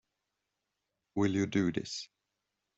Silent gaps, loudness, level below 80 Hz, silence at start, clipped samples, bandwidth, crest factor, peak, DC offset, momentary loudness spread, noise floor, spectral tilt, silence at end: none; -33 LUFS; -70 dBFS; 1.15 s; under 0.1%; 8 kHz; 20 dB; -16 dBFS; under 0.1%; 11 LU; -86 dBFS; -5.5 dB/octave; 0.75 s